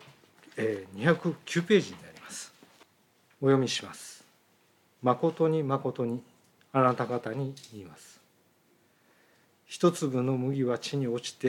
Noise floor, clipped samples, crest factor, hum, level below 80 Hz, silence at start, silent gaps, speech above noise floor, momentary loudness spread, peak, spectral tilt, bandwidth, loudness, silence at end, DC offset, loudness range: -66 dBFS; under 0.1%; 22 dB; none; -82 dBFS; 0.55 s; none; 38 dB; 19 LU; -10 dBFS; -6 dB/octave; 16.5 kHz; -29 LUFS; 0 s; under 0.1%; 4 LU